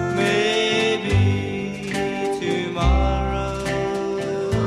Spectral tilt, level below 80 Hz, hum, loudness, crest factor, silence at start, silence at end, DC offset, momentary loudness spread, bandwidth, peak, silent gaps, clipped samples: -5.5 dB/octave; -28 dBFS; none; -22 LUFS; 14 dB; 0 s; 0 s; under 0.1%; 6 LU; 12.5 kHz; -6 dBFS; none; under 0.1%